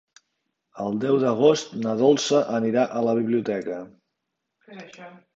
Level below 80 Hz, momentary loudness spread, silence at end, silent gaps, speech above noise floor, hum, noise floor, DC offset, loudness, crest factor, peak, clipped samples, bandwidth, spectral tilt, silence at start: -70 dBFS; 19 LU; 0.25 s; none; 58 dB; none; -81 dBFS; under 0.1%; -22 LUFS; 20 dB; -4 dBFS; under 0.1%; 7.8 kHz; -5.5 dB/octave; 0.75 s